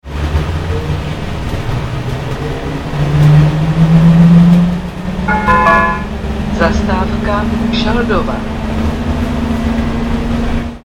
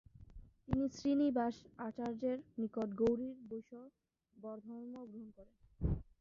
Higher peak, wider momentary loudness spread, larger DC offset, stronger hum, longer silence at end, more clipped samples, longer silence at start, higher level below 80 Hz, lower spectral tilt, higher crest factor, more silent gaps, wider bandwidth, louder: first, 0 dBFS vs -20 dBFS; second, 12 LU vs 19 LU; neither; neither; about the same, 0.05 s vs 0.15 s; neither; second, 0.05 s vs 0.2 s; first, -22 dBFS vs -54 dBFS; about the same, -7.5 dB/octave vs -8 dB/octave; second, 12 dB vs 20 dB; neither; first, 10.5 kHz vs 7.4 kHz; first, -13 LUFS vs -40 LUFS